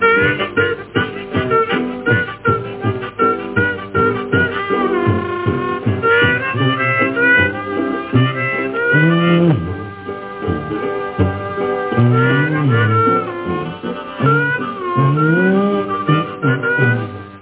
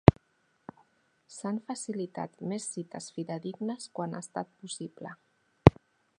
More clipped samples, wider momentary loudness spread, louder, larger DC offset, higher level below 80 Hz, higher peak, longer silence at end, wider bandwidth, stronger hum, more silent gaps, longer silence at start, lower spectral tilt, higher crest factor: neither; second, 9 LU vs 23 LU; first, -16 LUFS vs -31 LUFS; neither; first, -40 dBFS vs -46 dBFS; about the same, -2 dBFS vs 0 dBFS; second, 0 s vs 0.5 s; second, 4 kHz vs 11 kHz; neither; neither; about the same, 0 s vs 0.1 s; first, -10.5 dB/octave vs -6.5 dB/octave; second, 14 dB vs 30 dB